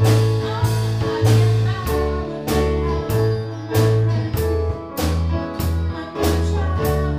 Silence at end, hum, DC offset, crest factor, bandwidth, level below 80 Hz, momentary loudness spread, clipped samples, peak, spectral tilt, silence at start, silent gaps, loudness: 0 s; none; under 0.1%; 14 dB; 16 kHz; -28 dBFS; 7 LU; under 0.1%; -4 dBFS; -6.5 dB/octave; 0 s; none; -20 LUFS